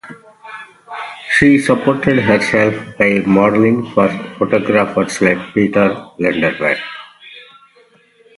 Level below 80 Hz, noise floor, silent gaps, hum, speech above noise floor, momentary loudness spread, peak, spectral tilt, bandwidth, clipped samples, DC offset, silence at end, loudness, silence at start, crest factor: -48 dBFS; -50 dBFS; none; none; 37 dB; 18 LU; 0 dBFS; -6 dB/octave; 11.5 kHz; under 0.1%; under 0.1%; 0.95 s; -14 LUFS; 0.05 s; 16 dB